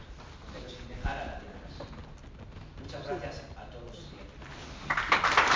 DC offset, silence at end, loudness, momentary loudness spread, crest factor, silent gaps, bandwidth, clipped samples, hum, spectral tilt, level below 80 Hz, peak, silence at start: under 0.1%; 0 s; -32 LUFS; 22 LU; 26 dB; none; 7.6 kHz; under 0.1%; none; -3.5 dB/octave; -46 dBFS; -8 dBFS; 0 s